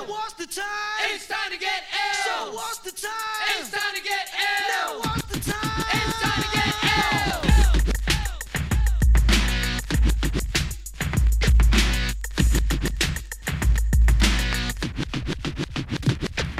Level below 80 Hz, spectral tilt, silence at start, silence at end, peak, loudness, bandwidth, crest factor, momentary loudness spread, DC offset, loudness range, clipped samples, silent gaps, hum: -24 dBFS; -4 dB/octave; 0 s; 0 s; -6 dBFS; -24 LUFS; 15.5 kHz; 16 dB; 10 LU; under 0.1%; 4 LU; under 0.1%; none; none